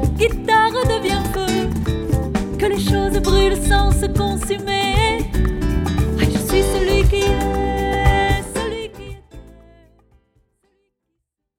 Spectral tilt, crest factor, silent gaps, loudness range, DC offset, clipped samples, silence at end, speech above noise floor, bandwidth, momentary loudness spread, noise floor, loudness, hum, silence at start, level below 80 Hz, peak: -5.5 dB/octave; 16 dB; none; 5 LU; under 0.1%; under 0.1%; 2.1 s; 60 dB; 16.5 kHz; 6 LU; -76 dBFS; -18 LUFS; none; 0 s; -24 dBFS; -2 dBFS